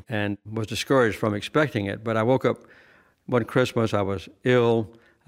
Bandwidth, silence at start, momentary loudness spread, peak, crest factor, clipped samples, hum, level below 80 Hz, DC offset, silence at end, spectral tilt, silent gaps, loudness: 16 kHz; 0.1 s; 8 LU; -6 dBFS; 18 dB; under 0.1%; none; -58 dBFS; under 0.1%; 0.35 s; -6 dB/octave; none; -24 LUFS